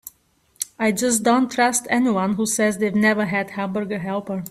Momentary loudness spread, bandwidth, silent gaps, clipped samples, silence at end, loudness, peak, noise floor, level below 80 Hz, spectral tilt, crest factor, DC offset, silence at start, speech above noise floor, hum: 8 LU; 15 kHz; none; under 0.1%; 0 s; -20 LUFS; -4 dBFS; -61 dBFS; -60 dBFS; -4 dB/octave; 16 dB; under 0.1%; 0.05 s; 41 dB; none